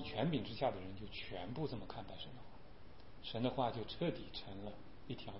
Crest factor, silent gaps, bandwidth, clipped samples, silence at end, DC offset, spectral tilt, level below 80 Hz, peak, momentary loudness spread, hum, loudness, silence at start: 22 dB; none; 5.6 kHz; under 0.1%; 0 s; 0.3%; -5 dB/octave; -60 dBFS; -22 dBFS; 19 LU; none; -43 LUFS; 0 s